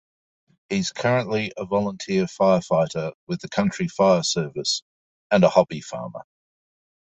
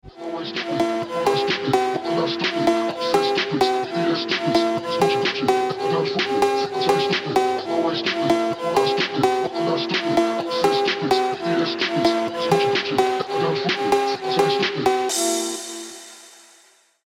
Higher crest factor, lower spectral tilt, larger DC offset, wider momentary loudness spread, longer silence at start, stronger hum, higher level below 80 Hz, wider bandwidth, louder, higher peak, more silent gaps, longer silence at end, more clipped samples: about the same, 20 dB vs 16 dB; about the same, -5 dB/octave vs -4 dB/octave; neither; first, 13 LU vs 3 LU; first, 0.7 s vs 0.05 s; neither; about the same, -58 dBFS vs -60 dBFS; second, 8.4 kHz vs 16 kHz; about the same, -22 LUFS vs -21 LUFS; about the same, -4 dBFS vs -6 dBFS; first, 3.15-3.27 s, 4.82-5.30 s vs none; first, 0.95 s vs 0.75 s; neither